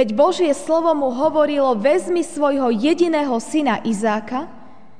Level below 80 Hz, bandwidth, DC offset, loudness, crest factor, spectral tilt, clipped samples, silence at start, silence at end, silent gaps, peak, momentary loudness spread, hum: -60 dBFS; 10 kHz; 1%; -18 LUFS; 14 dB; -5 dB/octave; under 0.1%; 0 s; 0.35 s; none; -4 dBFS; 5 LU; none